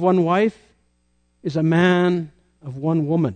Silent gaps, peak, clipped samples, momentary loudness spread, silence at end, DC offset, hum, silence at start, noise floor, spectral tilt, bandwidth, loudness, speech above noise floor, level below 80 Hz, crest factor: none; -6 dBFS; under 0.1%; 18 LU; 0 s; under 0.1%; 60 Hz at -35 dBFS; 0 s; -65 dBFS; -8 dB/octave; 9 kHz; -20 LUFS; 46 dB; -60 dBFS; 14 dB